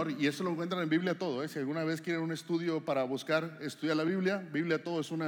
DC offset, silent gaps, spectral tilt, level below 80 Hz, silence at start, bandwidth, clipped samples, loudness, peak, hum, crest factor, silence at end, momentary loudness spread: under 0.1%; none; -6 dB/octave; under -90 dBFS; 0 s; 18 kHz; under 0.1%; -33 LUFS; -16 dBFS; none; 16 dB; 0 s; 4 LU